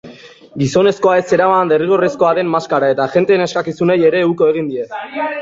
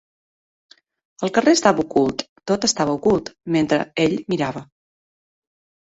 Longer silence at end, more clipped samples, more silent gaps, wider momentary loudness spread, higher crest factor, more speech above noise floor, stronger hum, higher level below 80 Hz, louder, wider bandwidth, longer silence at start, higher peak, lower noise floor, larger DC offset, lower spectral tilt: second, 0 s vs 1.2 s; neither; second, none vs 2.29-2.36 s; about the same, 9 LU vs 9 LU; second, 12 dB vs 20 dB; second, 24 dB vs over 71 dB; neither; about the same, -56 dBFS vs -54 dBFS; first, -14 LUFS vs -20 LUFS; about the same, 7.8 kHz vs 8 kHz; second, 0.05 s vs 1.2 s; about the same, -2 dBFS vs -2 dBFS; second, -38 dBFS vs under -90 dBFS; neither; first, -6 dB/octave vs -4.5 dB/octave